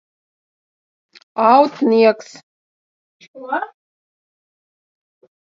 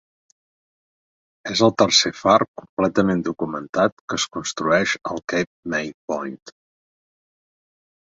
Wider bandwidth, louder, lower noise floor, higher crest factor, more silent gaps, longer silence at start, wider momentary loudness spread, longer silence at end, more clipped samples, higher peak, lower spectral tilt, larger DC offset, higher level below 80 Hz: about the same, 7.6 kHz vs 8 kHz; first, -15 LUFS vs -21 LUFS; about the same, under -90 dBFS vs under -90 dBFS; about the same, 20 dB vs 22 dB; first, 2.43-3.20 s, 3.28-3.34 s vs 2.48-2.54 s, 2.69-2.77 s, 3.69-3.73 s, 3.92-4.08 s, 5.47-5.63 s, 5.94-6.08 s, 6.42-6.46 s; about the same, 1.35 s vs 1.45 s; first, 18 LU vs 12 LU; first, 1.75 s vs 1.6 s; neither; about the same, 0 dBFS vs -2 dBFS; first, -5.5 dB/octave vs -3.5 dB/octave; neither; second, -74 dBFS vs -56 dBFS